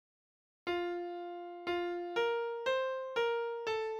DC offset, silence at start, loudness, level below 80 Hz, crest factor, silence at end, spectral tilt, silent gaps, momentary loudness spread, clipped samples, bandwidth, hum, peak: under 0.1%; 0.65 s; -36 LUFS; -74 dBFS; 14 dB; 0 s; -4 dB/octave; none; 8 LU; under 0.1%; 11 kHz; none; -24 dBFS